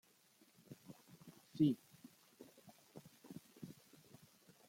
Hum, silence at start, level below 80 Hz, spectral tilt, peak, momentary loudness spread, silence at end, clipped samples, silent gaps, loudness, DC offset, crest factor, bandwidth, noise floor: none; 0.7 s; -84 dBFS; -7.5 dB/octave; -24 dBFS; 27 LU; 0.95 s; under 0.1%; none; -39 LUFS; under 0.1%; 24 dB; 16.5 kHz; -72 dBFS